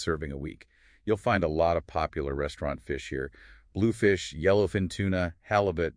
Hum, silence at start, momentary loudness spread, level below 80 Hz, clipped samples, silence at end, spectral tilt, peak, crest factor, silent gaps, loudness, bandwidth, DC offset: none; 0 s; 12 LU; -46 dBFS; under 0.1%; 0.05 s; -6.5 dB/octave; -10 dBFS; 18 dB; none; -28 LUFS; 10.5 kHz; under 0.1%